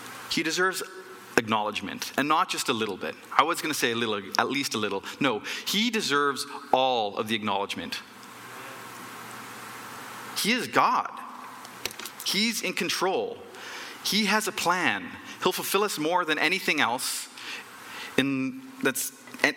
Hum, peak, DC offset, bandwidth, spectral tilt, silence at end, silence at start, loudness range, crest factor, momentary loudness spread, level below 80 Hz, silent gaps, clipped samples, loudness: none; -4 dBFS; under 0.1%; 17 kHz; -2.5 dB/octave; 0 s; 0 s; 4 LU; 24 dB; 16 LU; -72 dBFS; none; under 0.1%; -27 LUFS